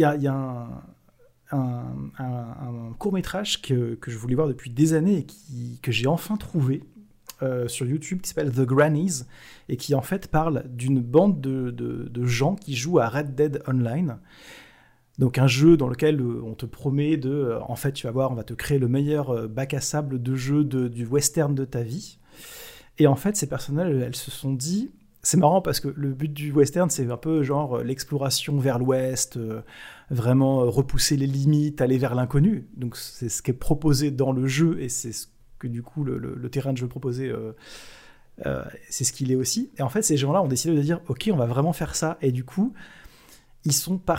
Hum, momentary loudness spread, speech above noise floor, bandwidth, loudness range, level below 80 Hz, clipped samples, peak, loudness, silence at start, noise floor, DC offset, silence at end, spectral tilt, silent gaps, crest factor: none; 13 LU; 34 dB; 16 kHz; 5 LU; -46 dBFS; under 0.1%; -4 dBFS; -24 LUFS; 0 s; -58 dBFS; under 0.1%; 0 s; -5.5 dB/octave; none; 20 dB